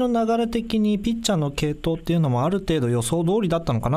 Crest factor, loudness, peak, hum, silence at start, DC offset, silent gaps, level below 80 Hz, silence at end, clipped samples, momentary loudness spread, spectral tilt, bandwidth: 14 dB; -22 LUFS; -6 dBFS; none; 0 s; under 0.1%; none; -40 dBFS; 0 s; under 0.1%; 3 LU; -6 dB/octave; 15.5 kHz